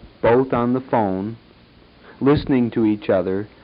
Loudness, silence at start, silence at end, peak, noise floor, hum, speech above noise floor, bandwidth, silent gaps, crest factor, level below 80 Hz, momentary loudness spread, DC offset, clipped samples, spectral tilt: -19 LUFS; 0.05 s; 0.15 s; -4 dBFS; -49 dBFS; none; 31 dB; 5.2 kHz; none; 16 dB; -44 dBFS; 7 LU; under 0.1%; under 0.1%; -12 dB/octave